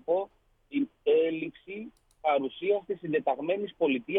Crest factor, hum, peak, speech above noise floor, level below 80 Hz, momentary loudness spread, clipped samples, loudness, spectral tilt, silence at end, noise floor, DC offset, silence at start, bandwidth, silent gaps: 16 dB; none; -14 dBFS; 26 dB; -70 dBFS; 16 LU; under 0.1%; -30 LUFS; -8 dB/octave; 0 s; -55 dBFS; under 0.1%; 0.1 s; 3.9 kHz; none